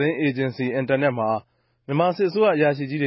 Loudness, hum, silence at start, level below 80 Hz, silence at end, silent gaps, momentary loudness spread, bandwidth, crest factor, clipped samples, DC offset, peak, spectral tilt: -22 LUFS; none; 0 s; -66 dBFS; 0 s; none; 7 LU; 5.8 kHz; 14 dB; under 0.1%; under 0.1%; -8 dBFS; -11.5 dB/octave